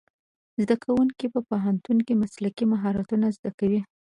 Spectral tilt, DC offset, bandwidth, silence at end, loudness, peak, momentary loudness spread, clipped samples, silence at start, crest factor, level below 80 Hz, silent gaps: -8 dB/octave; under 0.1%; 10.5 kHz; 0.3 s; -25 LUFS; -8 dBFS; 6 LU; under 0.1%; 0.6 s; 18 dB; -60 dBFS; 3.39-3.43 s, 3.54-3.58 s